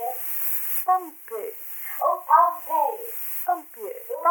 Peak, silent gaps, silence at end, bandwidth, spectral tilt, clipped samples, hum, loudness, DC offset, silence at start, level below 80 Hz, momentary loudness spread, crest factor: -4 dBFS; none; 0 s; 19 kHz; 0 dB/octave; under 0.1%; none; -24 LUFS; under 0.1%; 0 s; under -90 dBFS; 15 LU; 20 dB